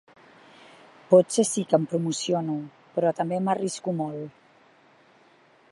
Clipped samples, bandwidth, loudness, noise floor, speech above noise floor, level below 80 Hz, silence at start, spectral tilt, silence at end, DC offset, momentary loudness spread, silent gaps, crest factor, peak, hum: under 0.1%; 11.5 kHz; -25 LUFS; -58 dBFS; 34 dB; -78 dBFS; 1.1 s; -5.5 dB/octave; 1.4 s; under 0.1%; 13 LU; none; 22 dB; -6 dBFS; none